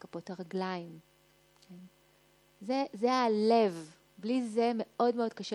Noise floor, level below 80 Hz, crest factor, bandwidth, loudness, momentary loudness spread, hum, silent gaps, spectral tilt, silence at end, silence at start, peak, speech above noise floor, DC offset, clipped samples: -66 dBFS; -80 dBFS; 18 dB; 11.5 kHz; -31 LUFS; 17 LU; none; none; -6 dB/octave; 0 s; 0.15 s; -14 dBFS; 34 dB; under 0.1%; under 0.1%